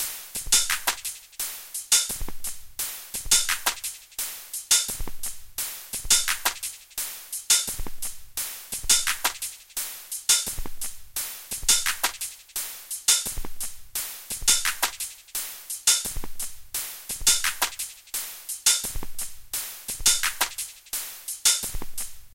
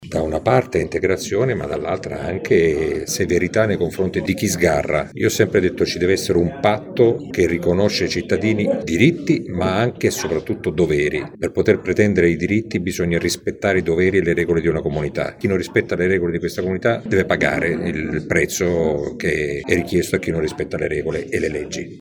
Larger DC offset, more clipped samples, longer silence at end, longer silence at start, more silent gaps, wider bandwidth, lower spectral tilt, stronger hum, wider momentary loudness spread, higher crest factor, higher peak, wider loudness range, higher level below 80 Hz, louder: neither; neither; about the same, 0 s vs 0 s; about the same, 0 s vs 0 s; neither; second, 17 kHz vs over 20 kHz; second, 1.5 dB/octave vs -5.5 dB/octave; neither; first, 13 LU vs 6 LU; about the same, 22 dB vs 18 dB; second, -6 dBFS vs 0 dBFS; about the same, 1 LU vs 2 LU; about the same, -42 dBFS vs -42 dBFS; second, -25 LUFS vs -19 LUFS